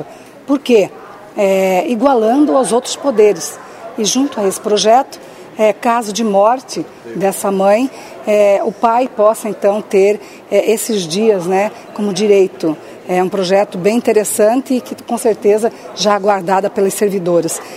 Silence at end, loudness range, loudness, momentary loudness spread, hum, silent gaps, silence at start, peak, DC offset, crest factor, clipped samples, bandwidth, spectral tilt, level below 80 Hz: 0 s; 1 LU; -14 LUFS; 10 LU; none; none; 0 s; 0 dBFS; under 0.1%; 14 dB; under 0.1%; 16 kHz; -4.5 dB/octave; -62 dBFS